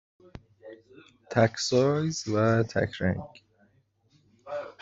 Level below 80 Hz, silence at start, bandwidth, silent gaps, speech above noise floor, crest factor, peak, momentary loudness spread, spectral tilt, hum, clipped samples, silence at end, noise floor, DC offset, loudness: -60 dBFS; 0.35 s; 8 kHz; none; 41 dB; 22 dB; -8 dBFS; 17 LU; -5.5 dB/octave; none; under 0.1%; 0.1 s; -67 dBFS; under 0.1%; -27 LUFS